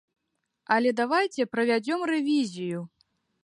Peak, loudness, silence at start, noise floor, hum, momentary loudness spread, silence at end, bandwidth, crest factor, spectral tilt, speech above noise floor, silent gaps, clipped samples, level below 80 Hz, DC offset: -8 dBFS; -26 LUFS; 0.7 s; -70 dBFS; none; 10 LU; 0.6 s; 11.5 kHz; 18 dB; -5 dB/octave; 44 dB; none; under 0.1%; -78 dBFS; under 0.1%